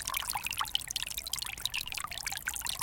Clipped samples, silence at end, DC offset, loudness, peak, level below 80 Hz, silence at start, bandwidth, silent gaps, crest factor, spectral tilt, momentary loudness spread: under 0.1%; 0 s; under 0.1%; -34 LUFS; -12 dBFS; -54 dBFS; 0 s; 17 kHz; none; 26 dB; 1 dB/octave; 3 LU